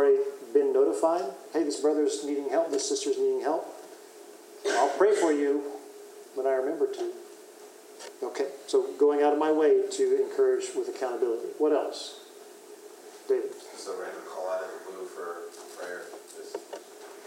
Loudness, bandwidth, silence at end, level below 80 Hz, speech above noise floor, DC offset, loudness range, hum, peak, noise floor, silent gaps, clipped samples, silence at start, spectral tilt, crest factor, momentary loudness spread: -28 LUFS; 16 kHz; 0 s; under -90 dBFS; 22 dB; under 0.1%; 10 LU; none; -10 dBFS; -49 dBFS; none; under 0.1%; 0 s; -2.5 dB/octave; 18 dB; 23 LU